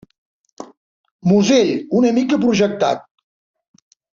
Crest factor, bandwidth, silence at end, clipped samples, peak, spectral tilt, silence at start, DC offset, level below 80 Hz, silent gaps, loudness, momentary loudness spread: 16 dB; 7.6 kHz; 1.15 s; under 0.1%; -2 dBFS; -5.5 dB/octave; 0.6 s; under 0.1%; -58 dBFS; 0.77-1.04 s, 1.11-1.19 s; -16 LUFS; 7 LU